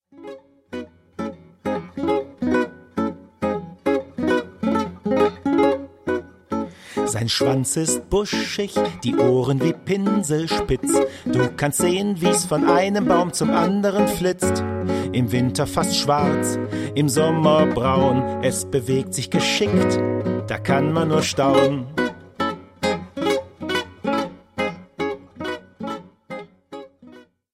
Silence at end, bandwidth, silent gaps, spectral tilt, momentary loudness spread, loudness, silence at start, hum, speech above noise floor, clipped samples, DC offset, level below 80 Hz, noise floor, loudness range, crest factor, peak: 0.35 s; 16 kHz; none; -5 dB/octave; 13 LU; -21 LUFS; 0.15 s; none; 27 dB; under 0.1%; under 0.1%; -48 dBFS; -47 dBFS; 7 LU; 18 dB; -4 dBFS